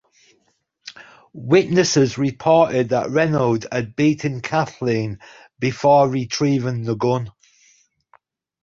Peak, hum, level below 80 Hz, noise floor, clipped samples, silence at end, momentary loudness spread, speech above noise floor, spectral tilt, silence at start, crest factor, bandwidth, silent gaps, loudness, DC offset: -2 dBFS; none; -56 dBFS; -66 dBFS; under 0.1%; 1.35 s; 18 LU; 48 dB; -5.5 dB/octave; 0.85 s; 18 dB; 7.6 kHz; none; -19 LUFS; under 0.1%